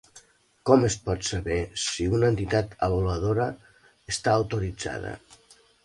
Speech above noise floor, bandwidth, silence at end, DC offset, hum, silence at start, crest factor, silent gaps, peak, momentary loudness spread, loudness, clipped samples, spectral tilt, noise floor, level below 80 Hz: 32 dB; 11.5 kHz; 0.7 s; under 0.1%; none; 0.15 s; 22 dB; none; -4 dBFS; 12 LU; -26 LUFS; under 0.1%; -5 dB/octave; -57 dBFS; -42 dBFS